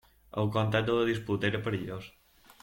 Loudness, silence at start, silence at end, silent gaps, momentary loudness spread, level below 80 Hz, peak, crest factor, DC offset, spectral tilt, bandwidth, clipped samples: -30 LUFS; 0.35 s; 0.55 s; none; 13 LU; -60 dBFS; -12 dBFS; 20 dB; under 0.1%; -7 dB/octave; 16.5 kHz; under 0.1%